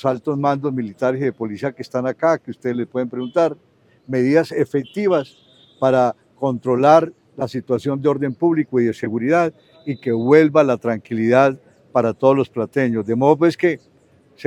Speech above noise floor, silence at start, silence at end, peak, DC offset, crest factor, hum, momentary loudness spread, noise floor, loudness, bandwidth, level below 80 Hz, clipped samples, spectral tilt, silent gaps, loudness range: 32 dB; 0.05 s; 0.05 s; 0 dBFS; under 0.1%; 18 dB; none; 11 LU; -50 dBFS; -19 LUFS; 11.5 kHz; -66 dBFS; under 0.1%; -7.5 dB/octave; none; 4 LU